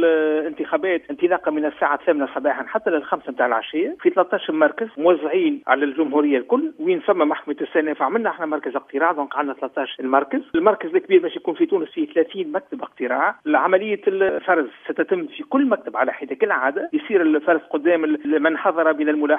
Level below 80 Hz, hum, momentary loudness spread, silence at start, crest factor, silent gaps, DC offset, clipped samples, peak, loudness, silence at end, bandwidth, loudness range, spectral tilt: -68 dBFS; none; 6 LU; 0 s; 20 dB; none; under 0.1%; under 0.1%; 0 dBFS; -21 LUFS; 0 s; 3.7 kHz; 2 LU; -8 dB/octave